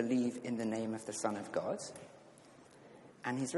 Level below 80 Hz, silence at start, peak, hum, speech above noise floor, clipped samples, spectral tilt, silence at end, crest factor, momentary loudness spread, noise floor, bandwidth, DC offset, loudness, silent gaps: -82 dBFS; 0 s; -20 dBFS; none; 22 dB; under 0.1%; -5 dB/octave; 0 s; 18 dB; 23 LU; -60 dBFS; 11.5 kHz; under 0.1%; -39 LUFS; none